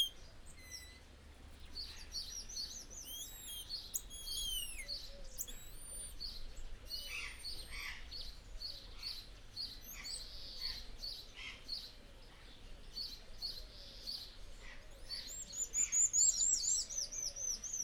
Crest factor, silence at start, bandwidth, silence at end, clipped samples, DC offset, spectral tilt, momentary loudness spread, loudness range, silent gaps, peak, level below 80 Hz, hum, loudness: 22 dB; 0 s; over 20 kHz; 0 s; under 0.1%; under 0.1%; 1 dB/octave; 22 LU; 13 LU; none; -22 dBFS; -54 dBFS; none; -40 LUFS